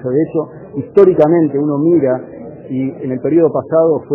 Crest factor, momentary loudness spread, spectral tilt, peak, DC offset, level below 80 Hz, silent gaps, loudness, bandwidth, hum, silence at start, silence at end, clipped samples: 14 dB; 14 LU; -7 dB/octave; 0 dBFS; under 0.1%; -54 dBFS; none; -14 LUFS; 3.5 kHz; none; 0 s; 0 s; 0.2%